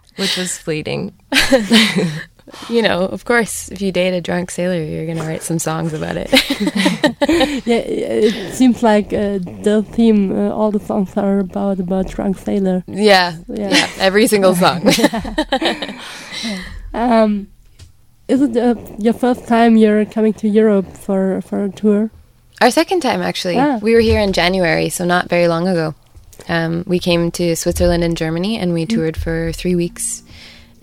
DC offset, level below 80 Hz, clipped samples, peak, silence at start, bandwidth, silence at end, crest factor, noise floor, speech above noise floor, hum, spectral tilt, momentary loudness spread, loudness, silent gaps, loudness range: under 0.1%; -36 dBFS; under 0.1%; 0 dBFS; 0.15 s; 16.5 kHz; 0.3 s; 16 dB; -43 dBFS; 28 dB; none; -5 dB/octave; 10 LU; -16 LUFS; none; 4 LU